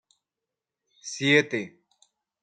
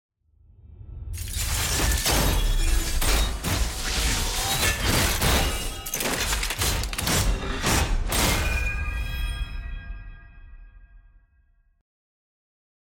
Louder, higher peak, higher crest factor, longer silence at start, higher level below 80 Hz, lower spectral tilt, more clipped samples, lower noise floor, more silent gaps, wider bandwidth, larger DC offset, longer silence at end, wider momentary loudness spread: about the same, -23 LUFS vs -25 LUFS; about the same, -6 dBFS vs -8 dBFS; first, 24 dB vs 18 dB; first, 1.05 s vs 0.65 s; second, -74 dBFS vs -28 dBFS; about the same, -4 dB/octave vs -3 dB/octave; neither; first, -88 dBFS vs -62 dBFS; neither; second, 9.4 kHz vs 17 kHz; neither; second, 0.75 s vs 1.8 s; first, 21 LU vs 13 LU